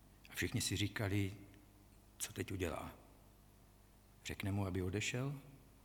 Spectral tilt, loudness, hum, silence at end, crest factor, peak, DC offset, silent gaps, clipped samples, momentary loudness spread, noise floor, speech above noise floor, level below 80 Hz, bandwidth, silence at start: -4.5 dB/octave; -42 LUFS; 50 Hz at -60 dBFS; 0.05 s; 20 dB; -24 dBFS; under 0.1%; none; under 0.1%; 15 LU; -65 dBFS; 24 dB; -62 dBFS; 19 kHz; 0.05 s